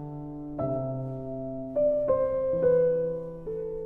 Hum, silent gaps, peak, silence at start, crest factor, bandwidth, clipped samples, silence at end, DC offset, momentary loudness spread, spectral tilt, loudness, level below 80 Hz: none; none; -14 dBFS; 0 s; 14 dB; 2.7 kHz; under 0.1%; 0 s; under 0.1%; 12 LU; -11.5 dB/octave; -28 LUFS; -52 dBFS